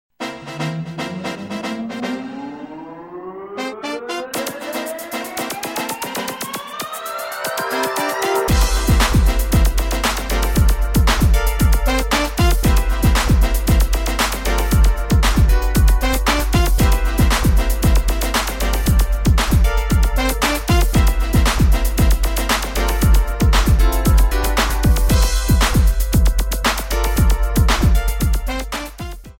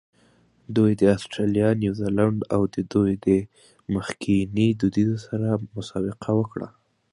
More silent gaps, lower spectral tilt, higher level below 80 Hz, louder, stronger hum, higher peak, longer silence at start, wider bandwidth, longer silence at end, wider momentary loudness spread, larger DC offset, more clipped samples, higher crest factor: neither; second, -4.5 dB/octave vs -7.5 dB/octave; first, -18 dBFS vs -50 dBFS; first, -18 LUFS vs -23 LUFS; neither; about the same, -4 dBFS vs -6 dBFS; second, 0.2 s vs 0.7 s; first, 17 kHz vs 11 kHz; second, 0.1 s vs 0.45 s; about the same, 11 LU vs 9 LU; neither; neither; second, 12 dB vs 18 dB